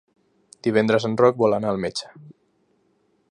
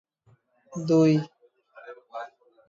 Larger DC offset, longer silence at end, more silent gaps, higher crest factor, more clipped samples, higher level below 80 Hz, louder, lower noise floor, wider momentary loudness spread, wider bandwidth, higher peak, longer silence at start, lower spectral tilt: neither; first, 1 s vs 0.45 s; neither; about the same, 22 dB vs 18 dB; neither; first, -62 dBFS vs -74 dBFS; about the same, -21 LUFS vs -23 LUFS; about the same, -66 dBFS vs -64 dBFS; second, 12 LU vs 25 LU; first, 11 kHz vs 7.6 kHz; first, -2 dBFS vs -10 dBFS; about the same, 0.65 s vs 0.7 s; second, -6 dB/octave vs -7.5 dB/octave